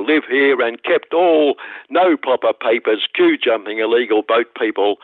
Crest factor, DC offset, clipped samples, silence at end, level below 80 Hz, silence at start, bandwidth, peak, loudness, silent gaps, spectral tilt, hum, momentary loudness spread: 12 dB; under 0.1%; under 0.1%; 0.1 s; -72 dBFS; 0 s; 4.3 kHz; -4 dBFS; -16 LUFS; none; -7 dB/octave; none; 5 LU